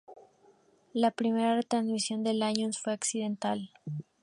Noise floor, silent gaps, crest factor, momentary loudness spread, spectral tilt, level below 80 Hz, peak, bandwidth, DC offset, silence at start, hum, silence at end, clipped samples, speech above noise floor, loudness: -63 dBFS; none; 20 dB; 10 LU; -4 dB/octave; -80 dBFS; -12 dBFS; 11.5 kHz; under 0.1%; 0.1 s; none; 0.2 s; under 0.1%; 33 dB; -31 LUFS